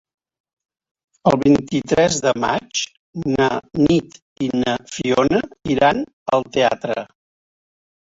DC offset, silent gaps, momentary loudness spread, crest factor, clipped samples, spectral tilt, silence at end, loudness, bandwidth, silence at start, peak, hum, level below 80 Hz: under 0.1%; 2.99-3.13 s, 4.22-4.36 s, 6.13-6.26 s; 8 LU; 18 dB; under 0.1%; -5 dB/octave; 1.05 s; -19 LUFS; 7.8 kHz; 1.25 s; -2 dBFS; none; -48 dBFS